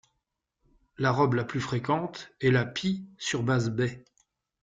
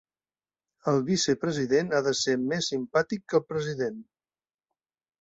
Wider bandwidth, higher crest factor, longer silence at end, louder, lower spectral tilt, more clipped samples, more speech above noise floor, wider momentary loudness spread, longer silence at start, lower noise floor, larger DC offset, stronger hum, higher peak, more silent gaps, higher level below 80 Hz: about the same, 9 kHz vs 8.2 kHz; about the same, 18 dB vs 18 dB; second, 0.65 s vs 1.2 s; about the same, -28 LUFS vs -27 LUFS; first, -6 dB/octave vs -4.5 dB/octave; neither; second, 54 dB vs over 63 dB; about the same, 7 LU vs 8 LU; first, 1 s vs 0.85 s; second, -82 dBFS vs under -90 dBFS; neither; neither; about the same, -10 dBFS vs -10 dBFS; neither; about the same, -62 dBFS vs -66 dBFS